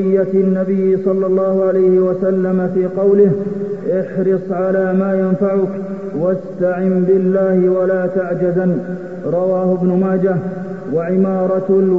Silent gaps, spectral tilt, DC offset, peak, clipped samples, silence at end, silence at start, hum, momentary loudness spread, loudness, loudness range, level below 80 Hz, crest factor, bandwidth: none; -11 dB/octave; 0.7%; -2 dBFS; under 0.1%; 0 s; 0 s; none; 7 LU; -16 LUFS; 3 LU; -56 dBFS; 12 dB; 2.9 kHz